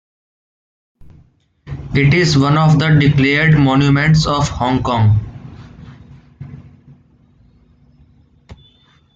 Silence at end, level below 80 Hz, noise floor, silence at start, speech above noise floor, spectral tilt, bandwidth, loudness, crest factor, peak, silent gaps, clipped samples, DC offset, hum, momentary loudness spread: 0.6 s; -38 dBFS; -52 dBFS; 1.65 s; 40 dB; -6.5 dB/octave; 7.8 kHz; -13 LUFS; 14 dB; -2 dBFS; none; under 0.1%; under 0.1%; none; 21 LU